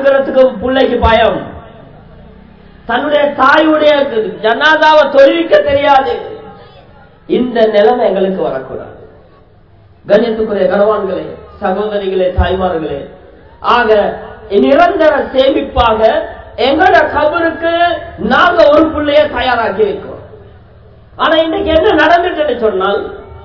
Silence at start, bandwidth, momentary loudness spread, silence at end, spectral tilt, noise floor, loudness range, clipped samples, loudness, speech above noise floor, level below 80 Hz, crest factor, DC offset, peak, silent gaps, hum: 0 s; 6 kHz; 12 LU; 0 s; -6.5 dB/octave; -42 dBFS; 5 LU; 1%; -10 LUFS; 33 dB; -32 dBFS; 12 dB; 0.3%; 0 dBFS; none; none